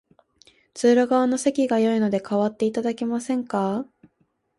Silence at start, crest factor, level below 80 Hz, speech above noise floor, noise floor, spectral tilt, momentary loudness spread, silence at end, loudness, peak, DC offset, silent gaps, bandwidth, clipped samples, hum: 0.75 s; 16 dB; -68 dBFS; 47 dB; -69 dBFS; -5.5 dB/octave; 8 LU; 0.75 s; -22 LUFS; -8 dBFS; under 0.1%; none; 11.5 kHz; under 0.1%; none